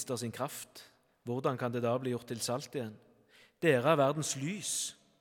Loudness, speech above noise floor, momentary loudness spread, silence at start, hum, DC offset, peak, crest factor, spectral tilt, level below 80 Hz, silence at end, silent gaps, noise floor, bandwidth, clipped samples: -33 LUFS; 31 dB; 16 LU; 0 s; none; under 0.1%; -12 dBFS; 22 dB; -4.5 dB/octave; -80 dBFS; 0.25 s; none; -64 dBFS; 18 kHz; under 0.1%